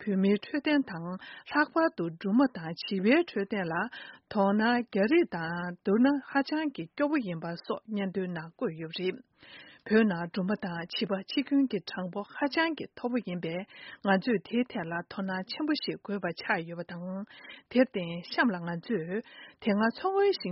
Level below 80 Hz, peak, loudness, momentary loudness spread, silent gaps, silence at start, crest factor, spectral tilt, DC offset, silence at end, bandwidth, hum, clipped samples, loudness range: -72 dBFS; -10 dBFS; -30 LUFS; 12 LU; none; 0 s; 20 dB; -4.5 dB/octave; under 0.1%; 0 s; 5.8 kHz; none; under 0.1%; 4 LU